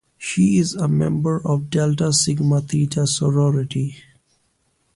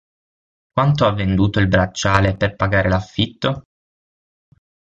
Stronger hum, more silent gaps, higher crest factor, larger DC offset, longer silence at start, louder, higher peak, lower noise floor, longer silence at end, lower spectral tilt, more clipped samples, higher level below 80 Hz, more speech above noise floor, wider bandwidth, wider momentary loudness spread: neither; neither; about the same, 16 dB vs 18 dB; neither; second, 0.2 s vs 0.75 s; about the same, -19 LUFS vs -18 LUFS; about the same, -4 dBFS vs -2 dBFS; second, -66 dBFS vs under -90 dBFS; second, 0.95 s vs 1.35 s; about the same, -5.5 dB/octave vs -6 dB/octave; neither; second, -52 dBFS vs -36 dBFS; second, 47 dB vs over 73 dB; first, 11.5 kHz vs 7.8 kHz; about the same, 5 LU vs 7 LU